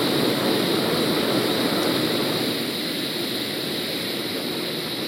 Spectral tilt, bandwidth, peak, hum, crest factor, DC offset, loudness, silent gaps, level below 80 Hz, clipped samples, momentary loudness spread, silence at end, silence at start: -4 dB/octave; 16 kHz; -8 dBFS; none; 14 dB; under 0.1%; -23 LUFS; none; -60 dBFS; under 0.1%; 5 LU; 0 s; 0 s